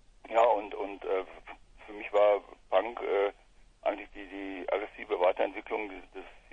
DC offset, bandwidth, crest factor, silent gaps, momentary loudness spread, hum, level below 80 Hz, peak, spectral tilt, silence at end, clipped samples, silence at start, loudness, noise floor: under 0.1%; 7.4 kHz; 22 dB; none; 20 LU; none; -60 dBFS; -10 dBFS; -4.5 dB/octave; 0.15 s; under 0.1%; 0.25 s; -31 LUFS; -59 dBFS